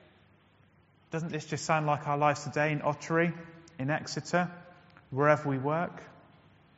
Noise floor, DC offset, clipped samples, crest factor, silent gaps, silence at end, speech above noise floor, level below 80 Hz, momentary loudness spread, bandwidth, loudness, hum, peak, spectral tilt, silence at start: -63 dBFS; under 0.1%; under 0.1%; 24 dB; none; 0.65 s; 33 dB; -70 dBFS; 12 LU; 8 kHz; -31 LUFS; none; -8 dBFS; -5 dB/octave; 1.1 s